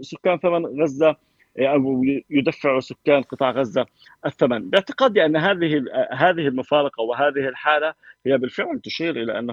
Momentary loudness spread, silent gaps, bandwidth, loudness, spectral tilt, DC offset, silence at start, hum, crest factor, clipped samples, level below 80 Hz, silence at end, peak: 7 LU; none; 7.4 kHz; -21 LUFS; -6.5 dB/octave; under 0.1%; 0 s; none; 18 dB; under 0.1%; -64 dBFS; 0 s; -2 dBFS